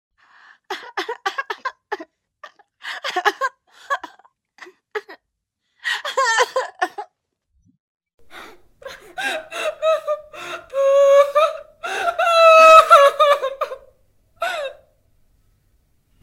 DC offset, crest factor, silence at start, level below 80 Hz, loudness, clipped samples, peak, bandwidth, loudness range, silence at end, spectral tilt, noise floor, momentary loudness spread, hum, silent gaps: under 0.1%; 20 dB; 0.7 s; -64 dBFS; -17 LUFS; under 0.1%; 0 dBFS; 16.5 kHz; 14 LU; 1.5 s; 0 dB/octave; -76 dBFS; 22 LU; none; 7.80-8.00 s, 8.14-8.18 s